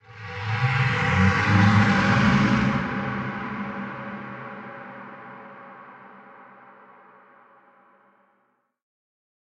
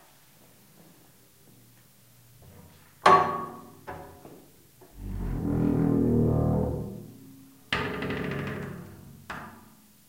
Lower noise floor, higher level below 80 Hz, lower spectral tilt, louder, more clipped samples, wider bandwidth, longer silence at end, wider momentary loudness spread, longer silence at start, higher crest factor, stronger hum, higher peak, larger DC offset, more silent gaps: first, -69 dBFS vs -58 dBFS; about the same, -48 dBFS vs -44 dBFS; about the same, -6.5 dB/octave vs -7 dB/octave; first, -22 LUFS vs -27 LUFS; neither; second, 8.4 kHz vs 16 kHz; first, 3.05 s vs 0.5 s; about the same, 23 LU vs 25 LU; second, 0.1 s vs 2.45 s; about the same, 20 dB vs 24 dB; neither; about the same, -6 dBFS vs -6 dBFS; neither; neither